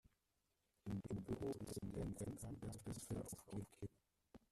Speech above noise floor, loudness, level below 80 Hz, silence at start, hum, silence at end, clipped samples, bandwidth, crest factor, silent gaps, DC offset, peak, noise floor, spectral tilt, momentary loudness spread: 38 dB; -50 LUFS; -66 dBFS; 0.85 s; none; 0.15 s; under 0.1%; 14.5 kHz; 14 dB; none; under 0.1%; -36 dBFS; -87 dBFS; -6.5 dB/octave; 10 LU